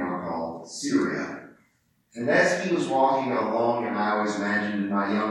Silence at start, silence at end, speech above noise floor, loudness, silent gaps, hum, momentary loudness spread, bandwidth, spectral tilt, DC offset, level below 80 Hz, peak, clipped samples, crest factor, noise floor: 0 s; 0 s; 43 dB; -25 LUFS; none; none; 11 LU; 12 kHz; -5 dB/octave; under 0.1%; -70 dBFS; -8 dBFS; under 0.1%; 16 dB; -67 dBFS